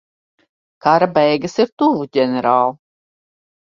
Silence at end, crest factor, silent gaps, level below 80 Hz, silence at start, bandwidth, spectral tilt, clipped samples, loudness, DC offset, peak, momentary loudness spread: 1.05 s; 18 dB; 1.72-1.77 s; -62 dBFS; 0.85 s; 7.6 kHz; -6 dB/octave; under 0.1%; -16 LUFS; under 0.1%; 0 dBFS; 5 LU